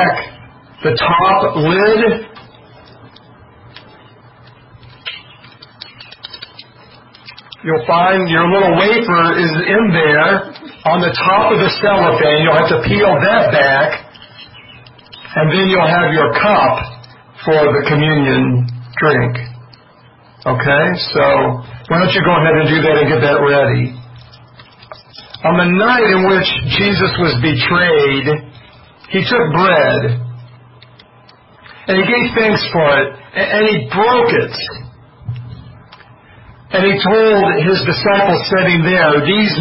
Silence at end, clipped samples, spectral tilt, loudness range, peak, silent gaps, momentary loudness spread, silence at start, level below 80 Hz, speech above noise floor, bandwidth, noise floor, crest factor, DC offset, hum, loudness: 0 s; under 0.1%; -10 dB/octave; 6 LU; 0 dBFS; none; 17 LU; 0 s; -44 dBFS; 32 dB; 5.8 kHz; -44 dBFS; 14 dB; under 0.1%; none; -12 LUFS